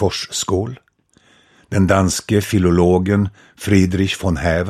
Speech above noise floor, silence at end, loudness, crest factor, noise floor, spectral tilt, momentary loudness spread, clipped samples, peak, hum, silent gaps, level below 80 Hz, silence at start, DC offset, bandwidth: 39 dB; 0 s; -17 LUFS; 16 dB; -55 dBFS; -5.5 dB/octave; 8 LU; under 0.1%; 0 dBFS; none; none; -38 dBFS; 0 s; under 0.1%; 15 kHz